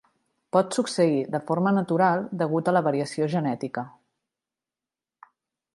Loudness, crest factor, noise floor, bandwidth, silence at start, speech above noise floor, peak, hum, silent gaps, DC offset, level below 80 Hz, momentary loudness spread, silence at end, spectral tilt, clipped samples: -25 LUFS; 20 dB; under -90 dBFS; 11.5 kHz; 0.55 s; over 66 dB; -6 dBFS; none; none; under 0.1%; -74 dBFS; 7 LU; 1.85 s; -6.5 dB/octave; under 0.1%